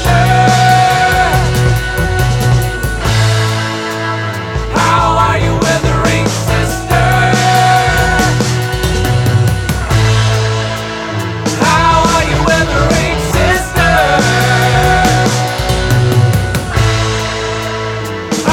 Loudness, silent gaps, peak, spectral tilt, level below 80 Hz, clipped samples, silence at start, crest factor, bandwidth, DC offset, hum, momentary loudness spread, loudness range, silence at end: -11 LUFS; none; 0 dBFS; -5 dB/octave; -22 dBFS; under 0.1%; 0 s; 10 dB; 17.5 kHz; under 0.1%; none; 8 LU; 3 LU; 0 s